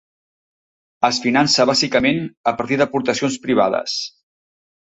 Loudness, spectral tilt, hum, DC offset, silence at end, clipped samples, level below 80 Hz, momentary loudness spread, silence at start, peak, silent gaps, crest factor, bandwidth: -18 LUFS; -3.5 dB/octave; none; under 0.1%; 0.75 s; under 0.1%; -56 dBFS; 8 LU; 1 s; -2 dBFS; 2.37-2.44 s; 18 dB; 8.2 kHz